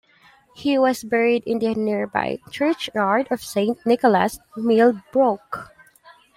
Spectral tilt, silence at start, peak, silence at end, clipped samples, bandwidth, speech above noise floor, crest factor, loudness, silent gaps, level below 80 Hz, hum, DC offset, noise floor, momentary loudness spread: -5.5 dB/octave; 0.6 s; -4 dBFS; 0.75 s; under 0.1%; 16 kHz; 34 dB; 18 dB; -21 LUFS; none; -60 dBFS; none; under 0.1%; -54 dBFS; 9 LU